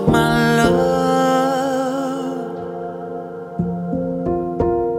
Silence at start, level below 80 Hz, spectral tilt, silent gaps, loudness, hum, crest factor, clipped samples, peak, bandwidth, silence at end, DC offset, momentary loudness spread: 0 s; -40 dBFS; -6 dB/octave; none; -19 LUFS; none; 16 dB; under 0.1%; -2 dBFS; 16.5 kHz; 0 s; under 0.1%; 13 LU